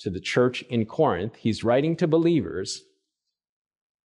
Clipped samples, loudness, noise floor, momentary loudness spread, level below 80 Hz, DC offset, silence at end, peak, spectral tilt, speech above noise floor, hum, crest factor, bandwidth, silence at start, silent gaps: under 0.1%; -24 LUFS; -83 dBFS; 9 LU; -58 dBFS; under 0.1%; 1.25 s; -10 dBFS; -6 dB/octave; 60 dB; none; 16 dB; 11 kHz; 0 s; none